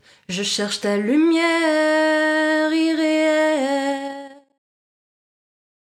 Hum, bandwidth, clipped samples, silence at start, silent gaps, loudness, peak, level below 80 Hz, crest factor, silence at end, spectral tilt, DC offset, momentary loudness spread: none; 14.5 kHz; under 0.1%; 0.3 s; none; -19 LUFS; -6 dBFS; -72 dBFS; 14 dB; 1.65 s; -3.5 dB/octave; under 0.1%; 8 LU